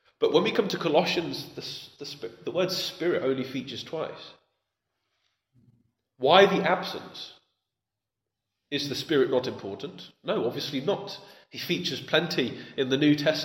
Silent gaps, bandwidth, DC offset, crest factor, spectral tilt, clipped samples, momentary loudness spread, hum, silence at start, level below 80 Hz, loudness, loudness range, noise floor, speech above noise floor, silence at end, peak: none; 16.5 kHz; under 0.1%; 26 dB; -5 dB/octave; under 0.1%; 16 LU; none; 0.2 s; -72 dBFS; -27 LUFS; 5 LU; -87 dBFS; 60 dB; 0 s; -2 dBFS